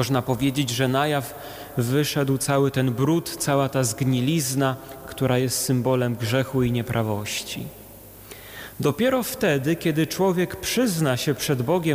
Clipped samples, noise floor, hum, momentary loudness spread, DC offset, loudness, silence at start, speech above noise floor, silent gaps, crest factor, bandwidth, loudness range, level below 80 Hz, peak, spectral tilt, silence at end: under 0.1%; -44 dBFS; none; 13 LU; under 0.1%; -23 LUFS; 0 s; 21 dB; none; 14 dB; 18.5 kHz; 3 LU; -52 dBFS; -10 dBFS; -5 dB/octave; 0 s